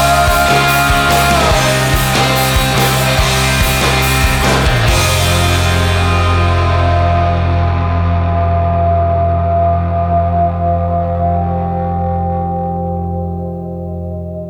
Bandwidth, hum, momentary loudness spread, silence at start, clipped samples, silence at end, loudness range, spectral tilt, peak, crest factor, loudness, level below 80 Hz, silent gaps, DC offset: over 20 kHz; none; 8 LU; 0 s; under 0.1%; 0 s; 5 LU; -4.5 dB/octave; 0 dBFS; 12 dB; -13 LUFS; -22 dBFS; none; under 0.1%